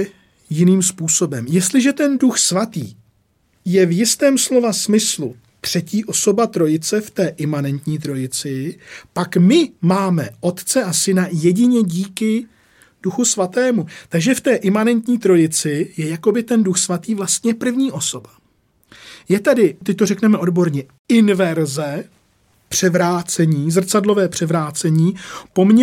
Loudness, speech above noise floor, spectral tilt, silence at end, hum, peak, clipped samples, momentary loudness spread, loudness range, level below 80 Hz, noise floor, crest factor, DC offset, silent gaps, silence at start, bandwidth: -17 LUFS; 44 dB; -5 dB/octave; 0 s; none; -2 dBFS; under 0.1%; 9 LU; 3 LU; -62 dBFS; -61 dBFS; 14 dB; under 0.1%; 20.99-21.05 s; 0 s; 16.5 kHz